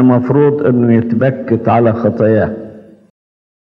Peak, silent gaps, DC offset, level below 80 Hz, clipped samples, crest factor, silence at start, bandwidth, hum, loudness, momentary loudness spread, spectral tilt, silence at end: 0 dBFS; none; under 0.1%; -54 dBFS; under 0.1%; 12 dB; 0 s; 4.9 kHz; none; -12 LUFS; 7 LU; -11.5 dB/octave; 1 s